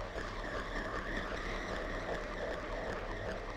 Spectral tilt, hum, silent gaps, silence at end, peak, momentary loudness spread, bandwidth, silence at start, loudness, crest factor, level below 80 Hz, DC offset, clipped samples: -5 dB/octave; none; none; 0 s; -26 dBFS; 2 LU; 12.5 kHz; 0 s; -40 LUFS; 14 dB; -46 dBFS; under 0.1%; under 0.1%